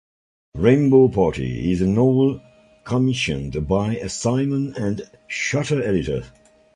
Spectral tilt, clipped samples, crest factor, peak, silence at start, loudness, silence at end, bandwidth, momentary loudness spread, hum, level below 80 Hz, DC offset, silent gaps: -6.5 dB/octave; under 0.1%; 18 dB; -2 dBFS; 0.55 s; -20 LUFS; 0.45 s; 11 kHz; 12 LU; none; -42 dBFS; under 0.1%; none